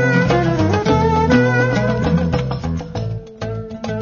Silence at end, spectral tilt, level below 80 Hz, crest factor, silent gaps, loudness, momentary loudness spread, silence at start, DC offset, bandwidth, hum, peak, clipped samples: 0 s; -7 dB/octave; -32 dBFS; 16 dB; none; -17 LUFS; 13 LU; 0 s; under 0.1%; 7.2 kHz; none; -2 dBFS; under 0.1%